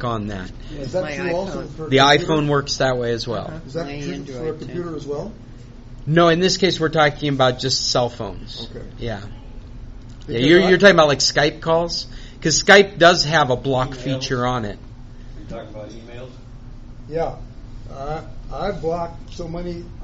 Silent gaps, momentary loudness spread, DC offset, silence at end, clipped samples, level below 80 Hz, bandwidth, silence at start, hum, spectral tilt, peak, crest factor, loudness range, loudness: none; 22 LU; under 0.1%; 0 s; under 0.1%; -38 dBFS; 8 kHz; 0 s; none; -3 dB/octave; 0 dBFS; 20 dB; 14 LU; -18 LUFS